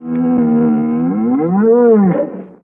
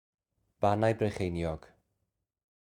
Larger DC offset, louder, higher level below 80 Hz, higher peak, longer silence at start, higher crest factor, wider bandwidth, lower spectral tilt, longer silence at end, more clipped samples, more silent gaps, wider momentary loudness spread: neither; first, -13 LUFS vs -31 LUFS; about the same, -54 dBFS vs -58 dBFS; first, -2 dBFS vs -12 dBFS; second, 0 s vs 0.6 s; second, 10 dB vs 22 dB; second, 2.9 kHz vs 12 kHz; first, -13 dB/octave vs -7.5 dB/octave; second, 0.15 s vs 1.1 s; neither; neither; second, 6 LU vs 9 LU